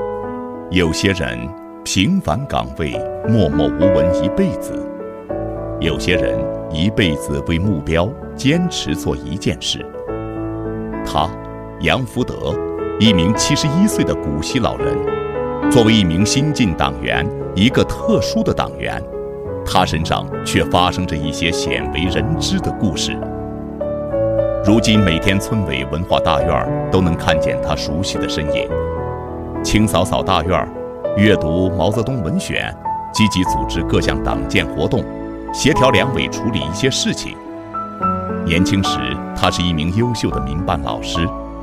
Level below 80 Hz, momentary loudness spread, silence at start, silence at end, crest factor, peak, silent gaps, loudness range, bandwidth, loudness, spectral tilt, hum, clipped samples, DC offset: -32 dBFS; 11 LU; 0 s; 0 s; 18 dB; 0 dBFS; none; 4 LU; 16 kHz; -18 LUFS; -5 dB/octave; none; under 0.1%; under 0.1%